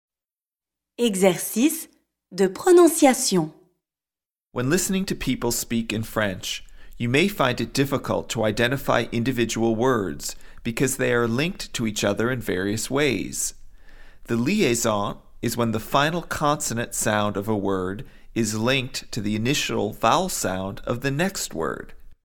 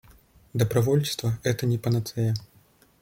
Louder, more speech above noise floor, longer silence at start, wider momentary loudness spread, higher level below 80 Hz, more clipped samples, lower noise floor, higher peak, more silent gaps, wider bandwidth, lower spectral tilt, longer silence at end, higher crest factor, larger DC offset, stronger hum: first, -23 LUFS vs -26 LUFS; first, over 67 dB vs 35 dB; first, 1 s vs 0.55 s; first, 10 LU vs 6 LU; first, -44 dBFS vs -56 dBFS; neither; first, under -90 dBFS vs -59 dBFS; first, -4 dBFS vs -8 dBFS; neither; about the same, 18 kHz vs 17 kHz; second, -4.5 dB/octave vs -6 dB/octave; second, 0.15 s vs 0.6 s; about the same, 20 dB vs 18 dB; neither; neither